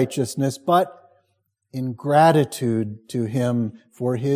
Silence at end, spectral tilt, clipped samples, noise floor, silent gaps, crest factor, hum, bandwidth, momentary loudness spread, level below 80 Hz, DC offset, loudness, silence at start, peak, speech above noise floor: 0 s; -6.5 dB/octave; under 0.1%; -71 dBFS; none; 18 dB; none; 16 kHz; 13 LU; -62 dBFS; under 0.1%; -22 LUFS; 0 s; -4 dBFS; 51 dB